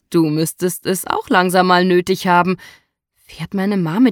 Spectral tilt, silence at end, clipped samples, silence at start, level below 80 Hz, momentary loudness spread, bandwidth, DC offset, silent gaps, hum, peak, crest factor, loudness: -5 dB/octave; 0 s; under 0.1%; 0.1 s; -56 dBFS; 9 LU; 18.5 kHz; under 0.1%; none; none; -2 dBFS; 16 dB; -16 LUFS